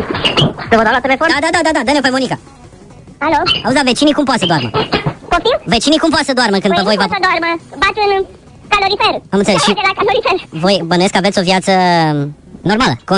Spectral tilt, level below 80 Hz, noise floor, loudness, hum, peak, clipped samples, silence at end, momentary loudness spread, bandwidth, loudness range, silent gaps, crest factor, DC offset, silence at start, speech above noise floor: -4.5 dB/octave; -38 dBFS; -37 dBFS; -12 LUFS; none; 0 dBFS; under 0.1%; 0 s; 6 LU; 11 kHz; 1 LU; none; 14 dB; under 0.1%; 0 s; 24 dB